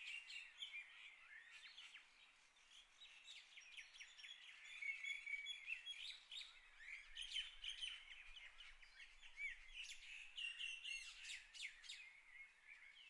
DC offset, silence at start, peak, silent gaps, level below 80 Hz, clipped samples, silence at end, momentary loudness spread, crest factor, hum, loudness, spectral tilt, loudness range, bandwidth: under 0.1%; 0 s; -36 dBFS; none; -76 dBFS; under 0.1%; 0 s; 14 LU; 20 dB; none; -53 LUFS; 3 dB/octave; 10 LU; 12 kHz